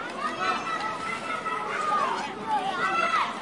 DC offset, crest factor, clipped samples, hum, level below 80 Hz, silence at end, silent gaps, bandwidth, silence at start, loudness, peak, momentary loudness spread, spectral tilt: under 0.1%; 14 dB; under 0.1%; none; -66 dBFS; 0 s; none; 11.5 kHz; 0 s; -27 LUFS; -14 dBFS; 6 LU; -3 dB/octave